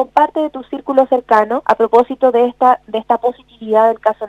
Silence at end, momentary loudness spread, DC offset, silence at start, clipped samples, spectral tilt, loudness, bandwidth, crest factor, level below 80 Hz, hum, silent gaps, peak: 0 s; 9 LU; under 0.1%; 0 s; under 0.1%; -6 dB/octave; -14 LUFS; 8.4 kHz; 14 dB; -56 dBFS; none; none; 0 dBFS